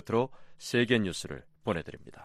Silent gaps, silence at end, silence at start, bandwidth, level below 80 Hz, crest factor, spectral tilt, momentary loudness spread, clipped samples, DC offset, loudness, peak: none; 0 s; 0.05 s; 14 kHz; -58 dBFS; 20 dB; -5 dB/octave; 16 LU; under 0.1%; under 0.1%; -31 LUFS; -12 dBFS